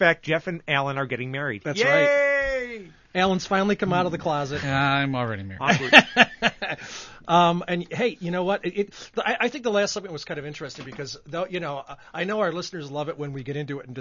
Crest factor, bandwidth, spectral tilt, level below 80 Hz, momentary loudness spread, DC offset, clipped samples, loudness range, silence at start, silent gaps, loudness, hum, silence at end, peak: 24 dB; 12 kHz; -4.5 dB/octave; -54 dBFS; 15 LU; under 0.1%; under 0.1%; 10 LU; 0 s; none; -23 LUFS; none; 0 s; 0 dBFS